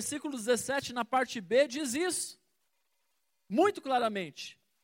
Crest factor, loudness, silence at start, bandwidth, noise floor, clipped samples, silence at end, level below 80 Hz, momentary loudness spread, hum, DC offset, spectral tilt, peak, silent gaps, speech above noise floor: 18 dB; -31 LUFS; 0 s; 16.5 kHz; -80 dBFS; under 0.1%; 0.3 s; -76 dBFS; 11 LU; none; under 0.1%; -3 dB/octave; -14 dBFS; none; 49 dB